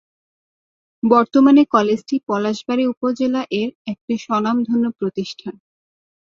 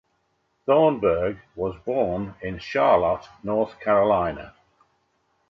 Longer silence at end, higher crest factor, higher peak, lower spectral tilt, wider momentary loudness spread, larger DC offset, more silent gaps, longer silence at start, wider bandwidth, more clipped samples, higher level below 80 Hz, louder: second, 0.75 s vs 1 s; about the same, 18 dB vs 16 dB; first, -2 dBFS vs -6 dBFS; second, -6 dB/octave vs -8 dB/octave; about the same, 14 LU vs 12 LU; neither; first, 2.97-3.01 s, 3.75-3.85 s, 4.01-4.08 s vs none; first, 1.05 s vs 0.65 s; about the same, 7.2 kHz vs 6.6 kHz; neither; second, -64 dBFS vs -50 dBFS; first, -18 LUFS vs -23 LUFS